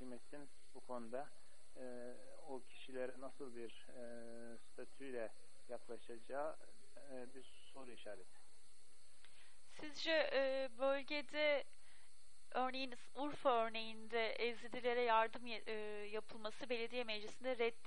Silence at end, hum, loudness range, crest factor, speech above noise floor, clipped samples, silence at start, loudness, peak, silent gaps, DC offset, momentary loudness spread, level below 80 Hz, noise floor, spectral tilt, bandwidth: 0.15 s; none; 13 LU; 22 dB; 26 dB; under 0.1%; 0 s; -43 LUFS; -22 dBFS; none; 0.5%; 20 LU; -82 dBFS; -71 dBFS; -3.5 dB/octave; 11.5 kHz